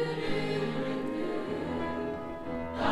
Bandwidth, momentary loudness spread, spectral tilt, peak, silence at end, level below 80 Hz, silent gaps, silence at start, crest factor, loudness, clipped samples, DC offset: 13 kHz; 5 LU; -6.5 dB/octave; -14 dBFS; 0 s; -52 dBFS; none; 0 s; 18 dB; -34 LUFS; under 0.1%; under 0.1%